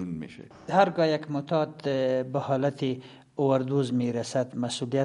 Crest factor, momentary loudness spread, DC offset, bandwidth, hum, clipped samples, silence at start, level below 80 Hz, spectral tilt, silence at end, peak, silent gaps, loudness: 20 dB; 13 LU; under 0.1%; 11.5 kHz; none; under 0.1%; 0 s; -68 dBFS; -6.5 dB/octave; 0 s; -8 dBFS; none; -27 LUFS